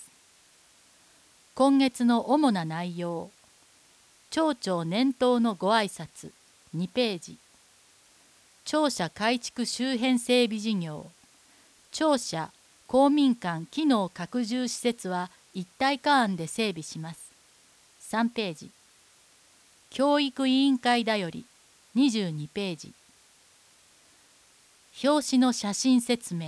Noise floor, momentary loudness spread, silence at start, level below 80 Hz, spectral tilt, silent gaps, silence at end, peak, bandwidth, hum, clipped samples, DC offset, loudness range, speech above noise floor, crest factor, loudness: -59 dBFS; 17 LU; 0 s; -70 dBFS; -4.5 dB/octave; none; 0 s; -10 dBFS; 11 kHz; none; under 0.1%; under 0.1%; 6 LU; 33 dB; 18 dB; -27 LUFS